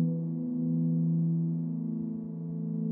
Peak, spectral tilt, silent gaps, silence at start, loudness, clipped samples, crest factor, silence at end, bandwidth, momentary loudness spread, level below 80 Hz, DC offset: -20 dBFS; -16.5 dB/octave; none; 0 s; -31 LUFS; under 0.1%; 12 dB; 0 s; 1.2 kHz; 8 LU; -74 dBFS; under 0.1%